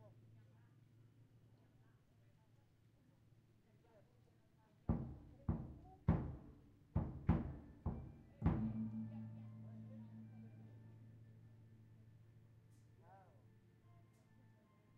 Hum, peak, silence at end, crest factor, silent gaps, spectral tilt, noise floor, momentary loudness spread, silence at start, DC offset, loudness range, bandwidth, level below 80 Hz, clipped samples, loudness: none; -22 dBFS; 0.45 s; 26 dB; none; -10 dB/octave; -72 dBFS; 26 LU; 0 s; under 0.1%; 21 LU; 4.7 kHz; -58 dBFS; under 0.1%; -46 LUFS